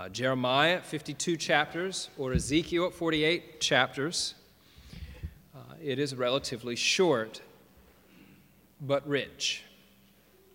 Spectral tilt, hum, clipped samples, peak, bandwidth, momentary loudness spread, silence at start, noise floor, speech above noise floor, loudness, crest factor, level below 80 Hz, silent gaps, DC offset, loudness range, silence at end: -3.5 dB/octave; none; under 0.1%; -8 dBFS; 17 kHz; 19 LU; 0 s; -61 dBFS; 32 dB; -29 LUFS; 24 dB; -52 dBFS; none; under 0.1%; 4 LU; 0.9 s